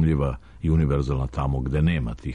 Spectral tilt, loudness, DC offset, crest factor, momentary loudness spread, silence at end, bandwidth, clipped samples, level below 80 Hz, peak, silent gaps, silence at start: -9 dB/octave; -24 LUFS; under 0.1%; 12 dB; 6 LU; 0 s; 9.4 kHz; under 0.1%; -30 dBFS; -12 dBFS; none; 0 s